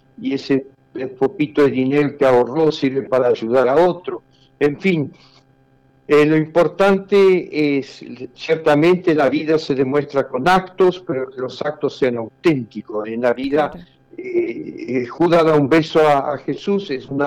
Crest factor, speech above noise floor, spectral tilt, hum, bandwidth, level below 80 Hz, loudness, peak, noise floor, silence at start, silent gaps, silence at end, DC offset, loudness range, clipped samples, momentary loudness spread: 10 dB; 37 dB; -7 dB/octave; none; 12 kHz; -54 dBFS; -17 LUFS; -8 dBFS; -54 dBFS; 0.2 s; none; 0 s; under 0.1%; 5 LU; under 0.1%; 12 LU